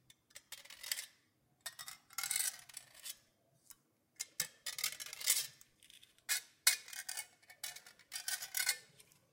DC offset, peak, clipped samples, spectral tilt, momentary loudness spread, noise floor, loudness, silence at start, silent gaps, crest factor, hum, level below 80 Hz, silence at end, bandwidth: under 0.1%; -12 dBFS; under 0.1%; 3 dB/octave; 19 LU; -75 dBFS; -39 LUFS; 0.35 s; none; 32 dB; none; -86 dBFS; 0.3 s; 17 kHz